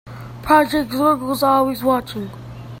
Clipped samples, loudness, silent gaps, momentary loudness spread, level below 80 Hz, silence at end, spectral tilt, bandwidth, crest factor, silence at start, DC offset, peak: under 0.1%; -17 LUFS; none; 19 LU; -46 dBFS; 0 s; -5.5 dB/octave; 16.5 kHz; 18 dB; 0.05 s; under 0.1%; 0 dBFS